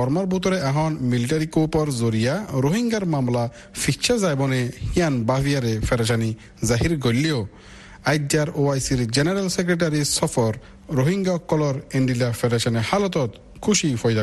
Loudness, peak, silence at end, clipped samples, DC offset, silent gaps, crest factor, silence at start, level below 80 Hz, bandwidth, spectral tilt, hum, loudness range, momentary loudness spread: -22 LUFS; -6 dBFS; 0 s; under 0.1%; under 0.1%; none; 16 dB; 0 s; -42 dBFS; 12.5 kHz; -5 dB/octave; none; 1 LU; 5 LU